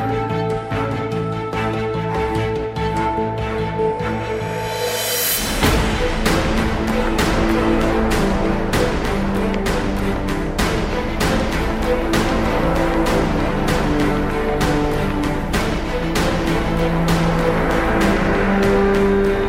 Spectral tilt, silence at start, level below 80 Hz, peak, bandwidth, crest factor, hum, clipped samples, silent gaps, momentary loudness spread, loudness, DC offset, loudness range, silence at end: -5.5 dB/octave; 0 s; -26 dBFS; -2 dBFS; 16 kHz; 16 dB; none; under 0.1%; none; 5 LU; -19 LUFS; under 0.1%; 4 LU; 0 s